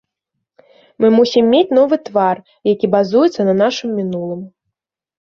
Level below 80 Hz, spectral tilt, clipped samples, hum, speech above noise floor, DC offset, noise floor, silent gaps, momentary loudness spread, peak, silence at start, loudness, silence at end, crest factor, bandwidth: -60 dBFS; -6.5 dB/octave; under 0.1%; none; 64 dB; under 0.1%; -78 dBFS; none; 9 LU; -2 dBFS; 1 s; -14 LUFS; 0.75 s; 14 dB; 7.2 kHz